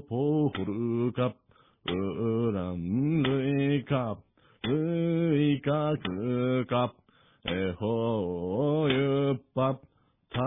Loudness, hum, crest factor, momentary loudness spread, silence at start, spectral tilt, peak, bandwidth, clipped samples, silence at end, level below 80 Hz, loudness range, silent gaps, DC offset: -29 LUFS; none; 14 dB; 8 LU; 0 s; -11 dB/octave; -14 dBFS; 3.9 kHz; under 0.1%; 0 s; -60 dBFS; 2 LU; none; under 0.1%